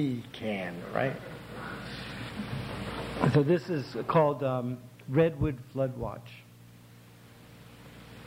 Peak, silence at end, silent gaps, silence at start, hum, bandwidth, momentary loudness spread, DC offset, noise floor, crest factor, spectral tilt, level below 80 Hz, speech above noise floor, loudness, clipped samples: -12 dBFS; 0 s; none; 0 s; none; 16.5 kHz; 23 LU; under 0.1%; -53 dBFS; 20 dB; -7.5 dB/octave; -54 dBFS; 24 dB; -31 LUFS; under 0.1%